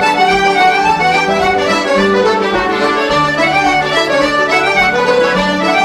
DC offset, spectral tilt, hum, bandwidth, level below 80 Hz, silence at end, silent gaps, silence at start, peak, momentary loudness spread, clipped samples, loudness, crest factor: under 0.1%; -4 dB/octave; none; 15 kHz; -38 dBFS; 0 s; none; 0 s; 0 dBFS; 3 LU; under 0.1%; -11 LUFS; 10 dB